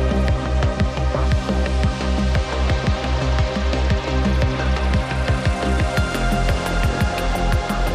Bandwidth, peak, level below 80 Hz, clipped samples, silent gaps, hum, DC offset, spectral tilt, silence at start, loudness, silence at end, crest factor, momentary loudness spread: 14 kHz; -6 dBFS; -22 dBFS; under 0.1%; none; none; under 0.1%; -6 dB/octave; 0 s; -21 LUFS; 0 s; 12 dB; 1 LU